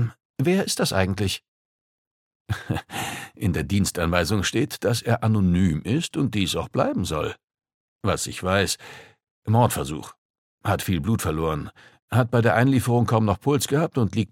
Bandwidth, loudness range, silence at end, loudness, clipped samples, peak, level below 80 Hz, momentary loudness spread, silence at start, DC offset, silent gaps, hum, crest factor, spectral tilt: 16.5 kHz; 4 LU; 0.05 s; -23 LUFS; under 0.1%; -2 dBFS; -46 dBFS; 11 LU; 0 s; under 0.1%; 0.25-0.34 s, 1.48-2.45 s, 7.44-7.48 s, 7.74-7.99 s, 9.31-9.42 s, 10.18-10.58 s, 12.02-12.08 s; none; 20 dB; -5.5 dB/octave